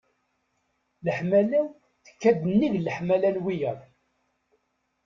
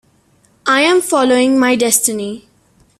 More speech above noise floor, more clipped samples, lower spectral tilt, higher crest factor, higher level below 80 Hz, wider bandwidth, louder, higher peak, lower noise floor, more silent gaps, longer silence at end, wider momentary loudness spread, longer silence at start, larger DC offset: first, 50 dB vs 41 dB; neither; first, -8 dB/octave vs -2 dB/octave; about the same, 18 dB vs 16 dB; second, -64 dBFS vs -58 dBFS; second, 7.2 kHz vs 16 kHz; second, -25 LUFS vs -13 LUFS; second, -10 dBFS vs 0 dBFS; first, -74 dBFS vs -54 dBFS; neither; first, 1.25 s vs 0.6 s; about the same, 10 LU vs 12 LU; first, 1.05 s vs 0.65 s; neither